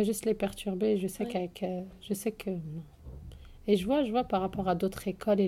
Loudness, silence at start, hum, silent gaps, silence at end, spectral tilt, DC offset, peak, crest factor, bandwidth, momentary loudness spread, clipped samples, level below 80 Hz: -32 LUFS; 0 s; none; none; 0 s; -6 dB/octave; under 0.1%; -14 dBFS; 18 dB; 15.5 kHz; 16 LU; under 0.1%; -54 dBFS